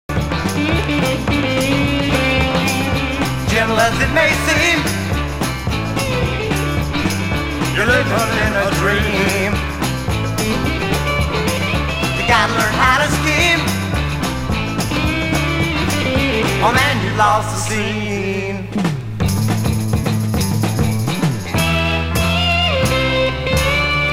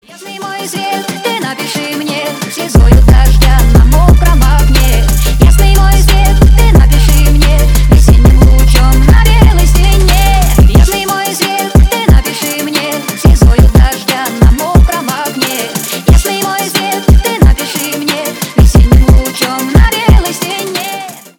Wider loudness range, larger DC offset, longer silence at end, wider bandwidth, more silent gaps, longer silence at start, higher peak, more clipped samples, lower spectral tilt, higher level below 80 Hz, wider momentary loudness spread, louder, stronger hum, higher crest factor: about the same, 3 LU vs 4 LU; neither; second, 0 s vs 0.2 s; second, 16 kHz vs 19 kHz; neither; about the same, 0.1 s vs 0.2 s; about the same, 0 dBFS vs 0 dBFS; second, under 0.1% vs 1%; about the same, -4.5 dB/octave vs -5 dB/octave; second, -28 dBFS vs -8 dBFS; second, 6 LU vs 9 LU; second, -16 LUFS vs -9 LUFS; neither; first, 16 dB vs 6 dB